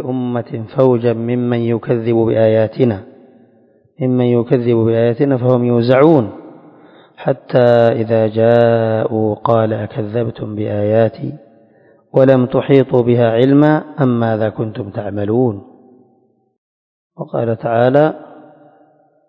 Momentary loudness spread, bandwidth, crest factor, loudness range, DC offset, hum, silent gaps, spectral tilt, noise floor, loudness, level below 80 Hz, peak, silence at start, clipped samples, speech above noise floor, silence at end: 11 LU; 5.4 kHz; 14 dB; 6 LU; under 0.1%; none; 16.58-17.10 s; -10.5 dB/octave; -56 dBFS; -14 LUFS; -52 dBFS; 0 dBFS; 0 s; 0.1%; 43 dB; 0.95 s